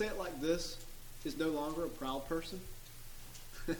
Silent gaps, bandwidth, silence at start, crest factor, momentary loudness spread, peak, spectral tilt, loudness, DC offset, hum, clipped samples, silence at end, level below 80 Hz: none; 19 kHz; 0 s; 18 dB; 16 LU; -20 dBFS; -4.5 dB/octave; -40 LUFS; under 0.1%; none; under 0.1%; 0 s; -50 dBFS